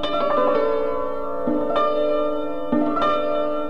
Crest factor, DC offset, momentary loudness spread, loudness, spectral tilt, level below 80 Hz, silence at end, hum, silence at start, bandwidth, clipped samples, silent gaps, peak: 12 dB; 4%; 6 LU; -22 LUFS; -6.5 dB/octave; -48 dBFS; 0 s; none; 0 s; 7 kHz; under 0.1%; none; -8 dBFS